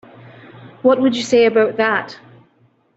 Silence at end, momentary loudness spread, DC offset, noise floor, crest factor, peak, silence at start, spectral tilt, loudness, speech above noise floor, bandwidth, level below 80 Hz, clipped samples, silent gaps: 0.8 s; 7 LU; under 0.1%; -57 dBFS; 16 dB; -2 dBFS; 0.55 s; -4.5 dB/octave; -16 LUFS; 42 dB; 8 kHz; -62 dBFS; under 0.1%; none